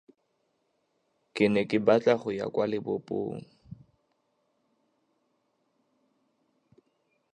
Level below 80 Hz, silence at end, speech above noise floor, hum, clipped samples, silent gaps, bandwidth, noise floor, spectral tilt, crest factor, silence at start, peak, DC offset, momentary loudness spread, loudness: -70 dBFS; 3.6 s; 49 dB; none; under 0.1%; none; 10.5 kHz; -75 dBFS; -7 dB/octave; 22 dB; 1.35 s; -10 dBFS; under 0.1%; 13 LU; -27 LUFS